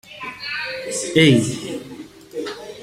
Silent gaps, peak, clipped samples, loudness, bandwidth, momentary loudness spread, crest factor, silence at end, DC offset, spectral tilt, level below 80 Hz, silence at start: none; -2 dBFS; under 0.1%; -20 LUFS; 15.5 kHz; 19 LU; 20 dB; 0 s; under 0.1%; -4.5 dB/octave; -56 dBFS; 0.05 s